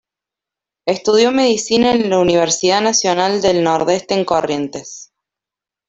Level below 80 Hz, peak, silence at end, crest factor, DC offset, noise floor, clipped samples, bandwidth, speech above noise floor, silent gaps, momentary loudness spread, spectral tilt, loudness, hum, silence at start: -52 dBFS; -2 dBFS; 0.85 s; 14 dB; under 0.1%; -87 dBFS; under 0.1%; 8.2 kHz; 73 dB; none; 11 LU; -3.5 dB/octave; -15 LUFS; none; 0.85 s